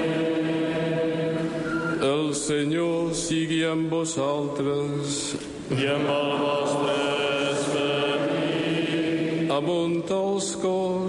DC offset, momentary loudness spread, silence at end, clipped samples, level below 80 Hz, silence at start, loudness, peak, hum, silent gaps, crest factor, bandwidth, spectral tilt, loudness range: under 0.1%; 3 LU; 0 s; under 0.1%; -58 dBFS; 0 s; -25 LUFS; -12 dBFS; none; none; 12 dB; 11.5 kHz; -4.5 dB/octave; 1 LU